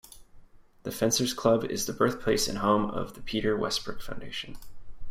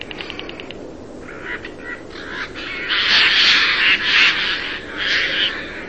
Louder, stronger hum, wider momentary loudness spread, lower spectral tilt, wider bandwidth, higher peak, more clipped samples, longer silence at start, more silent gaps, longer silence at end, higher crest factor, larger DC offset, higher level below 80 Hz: second, -28 LUFS vs -14 LUFS; neither; second, 14 LU vs 21 LU; first, -4 dB/octave vs -1.5 dB/octave; first, 16 kHz vs 8.6 kHz; second, -10 dBFS vs -2 dBFS; neither; about the same, 0.1 s vs 0 s; neither; about the same, 0 s vs 0 s; about the same, 20 dB vs 16 dB; second, under 0.1% vs 0.6%; about the same, -48 dBFS vs -46 dBFS